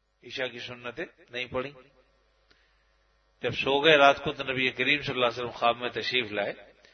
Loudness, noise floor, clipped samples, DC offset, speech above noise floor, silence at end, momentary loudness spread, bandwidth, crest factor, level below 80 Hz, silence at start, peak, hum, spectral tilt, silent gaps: -26 LUFS; -67 dBFS; under 0.1%; under 0.1%; 40 dB; 0.3 s; 18 LU; 6.6 kHz; 24 dB; -62 dBFS; 0.25 s; -4 dBFS; none; -4.5 dB/octave; none